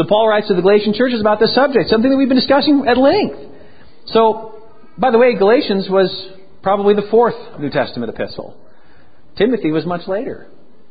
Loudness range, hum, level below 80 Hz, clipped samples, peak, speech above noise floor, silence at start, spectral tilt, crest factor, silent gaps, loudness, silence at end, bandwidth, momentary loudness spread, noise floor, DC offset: 6 LU; none; -50 dBFS; under 0.1%; 0 dBFS; 35 dB; 0 s; -10.5 dB/octave; 14 dB; none; -14 LUFS; 0.55 s; 5 kHz; 13 LU; -49 dBFS; 2%